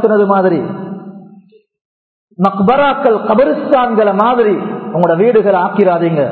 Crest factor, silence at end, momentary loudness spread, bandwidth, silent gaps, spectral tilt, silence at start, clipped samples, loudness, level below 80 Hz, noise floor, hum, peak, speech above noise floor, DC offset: 12 dB; 0 s; 8 LU; 4.5 kHz; 1.81-2.28 s; -9.5 dB/octave; 0 s; under 0.1%; -12 LUFS; -54 dBFS; -43 dBFS; none; 0 dBFS; 33 dB; under 0.1%